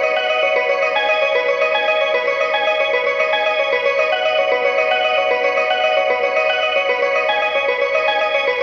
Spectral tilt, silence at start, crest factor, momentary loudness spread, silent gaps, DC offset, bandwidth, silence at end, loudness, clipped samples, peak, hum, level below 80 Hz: -1.5 dB/octave; 0 s; 12 dB; 1 LU; none; under 0.1%; 7.2 kHz; 0 s; -16 LUFS; under 0.1%; -4 dBFS; none; -66 dBFS